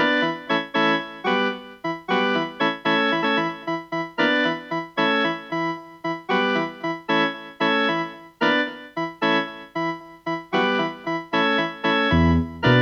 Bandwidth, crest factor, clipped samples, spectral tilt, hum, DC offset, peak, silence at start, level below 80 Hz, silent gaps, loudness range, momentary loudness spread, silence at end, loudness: 7.4 kHz; 18 dB; under 0.1%; -6 dB/octave; none; under 0.1%; -6 dBFS; 0 s; -44 dBFS; none; 2 LU; 10 LU; 0 s; -23 LUFS